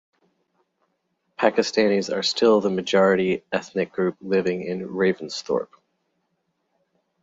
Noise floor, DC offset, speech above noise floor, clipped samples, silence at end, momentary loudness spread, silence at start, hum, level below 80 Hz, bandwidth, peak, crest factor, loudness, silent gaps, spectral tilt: -74 dBFS; under 0.1%; 52 dB; under 0.1%; 1.6 s; 9 LU; 1.4 s; none; -66 dBFS; 7.8 kHz; -4 dBFS; 20 dB; -22 LUFS; none; -5 dB/octave